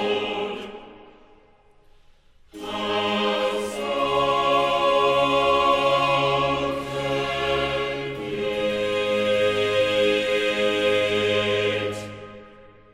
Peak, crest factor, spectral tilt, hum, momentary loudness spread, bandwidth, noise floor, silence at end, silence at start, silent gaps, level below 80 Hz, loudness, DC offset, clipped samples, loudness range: -8 dBFS; 14 dB; -4.5 dB/octave; none; 10 LU; 15 kHz; -55 dBFS; 0.3 s; 0 s; none; -50 dBFS; -22 LUFS; under 0.1%; under 0.1%; 7 LU